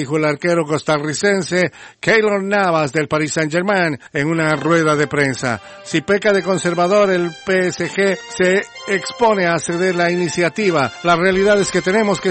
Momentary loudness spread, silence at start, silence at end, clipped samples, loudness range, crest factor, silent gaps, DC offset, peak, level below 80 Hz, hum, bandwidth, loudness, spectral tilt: 5 LU; 0 s; 0 s; under 0.1%; 1 LU; 14 dB; none; under 0.1%; -2 dBFS; -52 dBFS; none; 8.8 kHz; -16 LUFS; -5 dB/octave